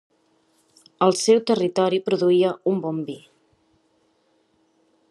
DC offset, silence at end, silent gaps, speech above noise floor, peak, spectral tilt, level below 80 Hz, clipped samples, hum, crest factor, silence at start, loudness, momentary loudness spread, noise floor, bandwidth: under 0.1%; 1.95 s; none; 45 dB; -4 dBFS; -5 dB/octave; -76 dBFS; under 0.1%; none; 20 dB; 1 s; -21 LUFS; 11 LU; -65 dBFS; 12 kHz